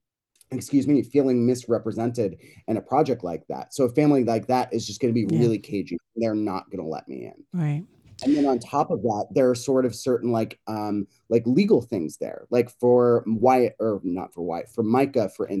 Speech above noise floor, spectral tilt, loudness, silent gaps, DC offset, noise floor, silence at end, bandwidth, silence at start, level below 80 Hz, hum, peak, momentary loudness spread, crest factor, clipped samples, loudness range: 40 dB; -7 dB/octave; -24 LUFS; none; under 0.1%; -64 dBFS; 0 s; 12.5 kHz; 0.5 s; -68 dBFS; none; -6 dBFS; 12 LU; 18 dB; under 0.1%; 4 LU